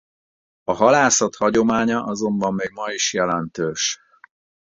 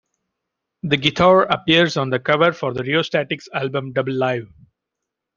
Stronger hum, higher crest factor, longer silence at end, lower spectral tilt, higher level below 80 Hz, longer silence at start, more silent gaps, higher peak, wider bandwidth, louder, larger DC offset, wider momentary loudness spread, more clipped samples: neither; about the same, 20 dB vs 18 dB; second, 0.75 s vs 0.9 s; second, -3 dB/octave vs -5.5 dB/octave; about the same, -56 dBFS vs -54 dBFS; second, 0.7 s vs 0.85 s; neither; about the same, -2 dBFS vs 0 dBFS; about the same, 8 kHz vs 7.4 kHz; about the same, -19 LUFS vs -18 LUFS; neither; about the same, 11 LU vs 10 LU; neither